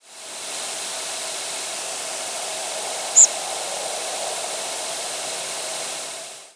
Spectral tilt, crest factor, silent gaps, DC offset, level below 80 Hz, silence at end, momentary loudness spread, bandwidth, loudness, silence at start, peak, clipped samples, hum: 2 dB/octave; 24 dB; none; under 0.1%; -80 dBFS; 0.05 s; 13 LU; 11 kHz; -22 LUFS; 0.05 s; -2 dBFS; under 0.1%; none